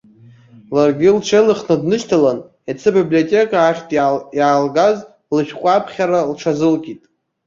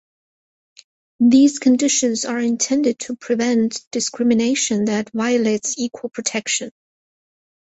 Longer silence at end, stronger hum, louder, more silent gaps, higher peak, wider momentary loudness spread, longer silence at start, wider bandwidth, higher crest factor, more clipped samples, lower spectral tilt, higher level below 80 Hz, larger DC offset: second, 0.5 s vs 1.05 s; neither; first, -15 LUFS vs -18 LUFS; second, none vs 3.87-3.91 s; about the same, -2 dBFS vs -4 dBFS; about the same, 8 LU vs 9 LU; second, 0.7 s vs 1.2 s; about the same, 7.6 kHz vs 8.2 kHz; about the same, 14 dB vs 16 dB; neither; first, -6 dB/octave vs -3 dB/octave; first, -58 dBFS vs -64 dBFS; neither